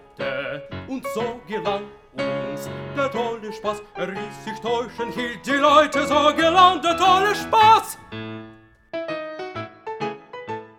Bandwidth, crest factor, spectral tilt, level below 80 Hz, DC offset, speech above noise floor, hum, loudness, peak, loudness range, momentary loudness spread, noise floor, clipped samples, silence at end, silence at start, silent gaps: 18 kHz; 22 dB; -4 dB/octave; -56 dBFS; under 0.1%; 26 dB; none; -21 LUFS; 0 dBFS; 11 LU; 18 LU; -47 dBFS; under 0.1%; 0.1 s; 0.2 s; none